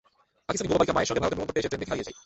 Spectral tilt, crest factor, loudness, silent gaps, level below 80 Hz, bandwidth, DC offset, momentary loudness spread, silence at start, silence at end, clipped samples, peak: -4.5 dB/octave; 20 dB; -27 LUFS; none; -50 dBFS; 8.2 kHz; under 0.1%; 9 LU; 0.5 s; 0.05 s; under 0.1%; -10 dBFS